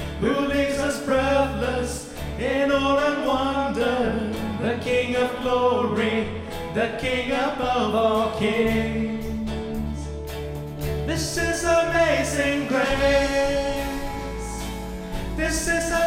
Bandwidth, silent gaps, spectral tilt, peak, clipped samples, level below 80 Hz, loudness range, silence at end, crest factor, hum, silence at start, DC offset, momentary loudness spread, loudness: 16.5 kHz; none; -4.5 dB/octave; -8 dBFS; under 0.1%; -36 dBFS; 3 LU; 0 s; 16 dB; none; 0 s; under 0.1%; 11 LU; -24 LUFS